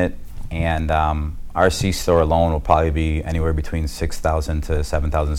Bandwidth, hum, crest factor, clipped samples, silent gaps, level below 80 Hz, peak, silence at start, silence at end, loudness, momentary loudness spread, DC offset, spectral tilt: 15 kHz; none; 18 dB; under 0.1%; none; -28 dBFS; -2 dBFS; 0 s; 0 s; -20 LUFS; 8 LU; under 0.1%; -6 dB/octave